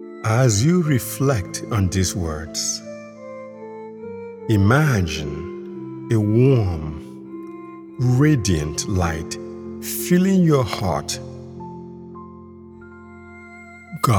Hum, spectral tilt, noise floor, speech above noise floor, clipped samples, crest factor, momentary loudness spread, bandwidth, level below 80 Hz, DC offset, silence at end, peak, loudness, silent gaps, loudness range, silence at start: none; -5.5 dB/octave; -41 dBFS; 22 dB; under 0.1%; 18 dB; 23 LU; 19.5 kHz; -42 dBFS; under 0.1%; 0 s; -2 dBFS; -20 LUFS; none; 5 LU; 0 s